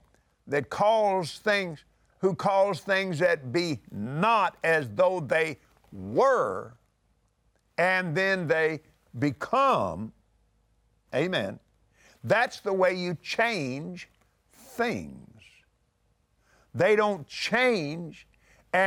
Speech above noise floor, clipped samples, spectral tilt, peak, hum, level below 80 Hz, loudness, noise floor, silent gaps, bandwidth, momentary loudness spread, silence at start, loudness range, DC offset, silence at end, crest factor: 44 dB; under 0.1%; -5.5 dB/octave; -12 dBFS; none; -66 dBFS; -26 LUFS; -70 dBFS; none; 16.5 kHz; 15 LU; 0.45 s; 4 LU; under 0.1%; 0 s; 18 dB